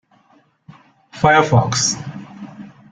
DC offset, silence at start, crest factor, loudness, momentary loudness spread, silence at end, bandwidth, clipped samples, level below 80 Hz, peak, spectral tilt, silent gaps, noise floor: under 0.1%; 1.15 s; 18 dB; -15 LUFS; 23 LU; 0.25 s; 9.4 kHz; under 0.1%; -50 dBFS; -2 dBFS; -4 dB/octave; none; -56 dBFS